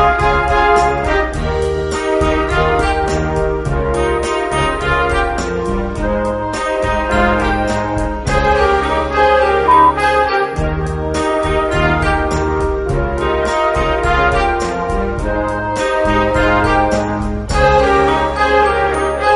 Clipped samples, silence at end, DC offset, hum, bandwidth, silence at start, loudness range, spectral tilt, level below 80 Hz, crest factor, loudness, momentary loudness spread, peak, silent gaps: under 0.1%; 0 s; under 0.1%; none; 11.5 kHz; 0 s; 3 LU; -5.5 dB/octave; -24 dBFS; 14 dB; -15 LUFS; 7 LU; 0 dBFS; none